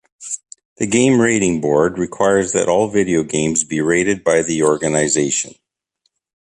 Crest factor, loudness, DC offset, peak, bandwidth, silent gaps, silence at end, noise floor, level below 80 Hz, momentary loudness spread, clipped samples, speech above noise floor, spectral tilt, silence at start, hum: 16 dB; -16 LUFS; under 0.1%; -2 dBFS; 11 kHz; 0.65-0.76 s; 0.95 s; -69 dBFS; -50 dBFS; 10 LU; under 0.1%; 53 dB; -4 dB/octave; 0.2 s; none